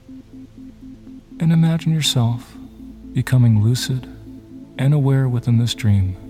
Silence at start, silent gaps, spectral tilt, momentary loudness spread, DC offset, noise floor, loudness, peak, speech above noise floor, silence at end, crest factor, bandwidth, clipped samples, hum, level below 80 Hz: 0.1 s; none; -6 dB/octave; 23 LU; under 0.1%; -38 dBFS; -18 LUFS; -4 dBFS; 20 dB; 0 s; 14 dB; 15.5 kHz; under 0.1%; none; -46 dBFS